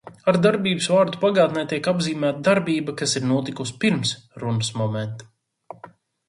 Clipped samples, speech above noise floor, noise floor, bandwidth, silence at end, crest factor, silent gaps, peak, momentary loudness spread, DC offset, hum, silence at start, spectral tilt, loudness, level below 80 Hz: under 0.1%; 26 dB; -47 dBFS; 11.5 kHz; 0.4 s; 18 dB; none; -4 dBFS; 12 LU; under 0.1%; none; 0.05 s; -5 dB/octave; -22 LUFS; -62 dBFS